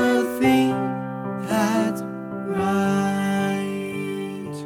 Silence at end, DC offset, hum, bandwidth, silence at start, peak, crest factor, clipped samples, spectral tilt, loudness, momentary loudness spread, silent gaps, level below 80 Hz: 0 s; under 0.1%; none; 18 kHz; 0 s; -8 dBFS; 14 dB; under 0.1%; -6 dB/octave; -23 LUFS; 11 LU; none; -60 dBFS